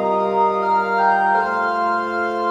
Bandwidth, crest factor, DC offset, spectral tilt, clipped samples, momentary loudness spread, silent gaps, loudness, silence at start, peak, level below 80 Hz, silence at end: 8.8 kHz; 12 dB; under 0.1%; -6 dB/octave; under 0.1%; 4 LU; none; -18 LUFS; 0 s; -6 dBFS; -58 dBFS; 0 s